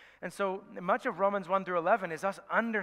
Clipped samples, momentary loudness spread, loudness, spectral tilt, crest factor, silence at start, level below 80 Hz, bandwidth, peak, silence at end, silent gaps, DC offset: under 0.1%; 6 LU; -32 LUFS; -5.5 dB/octave; 20 dB; 0 s; -78 dBFS; 15 kHz; -12 dBFS; 0 s; none; under 0.1%